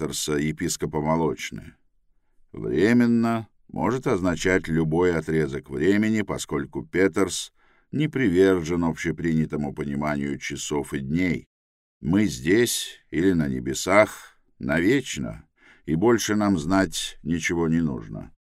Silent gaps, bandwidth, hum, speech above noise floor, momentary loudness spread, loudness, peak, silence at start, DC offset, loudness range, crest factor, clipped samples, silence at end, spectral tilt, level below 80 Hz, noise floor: 11.46-12.01 s; 16 kHz; none; 40 dB; 12 LU; -24 LUFS; -2 dBFS; 0 s; under 0.1%; 2 LU; 22 dB; under 0.1%; 0.3 s; -5 dB/octave; -48 dBFS; -63 dBFS